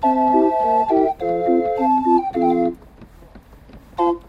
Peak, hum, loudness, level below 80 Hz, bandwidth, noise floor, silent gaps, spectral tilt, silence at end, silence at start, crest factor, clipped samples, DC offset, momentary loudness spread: -4 dBFS; none; -18 LUFS; -48 dBFS; 5.8 kHz; -44 dBFS; none; -8 dB/octave; 0.1 s; 0 s; 14 dB; under 0.1%; under 0.1%; 6 LU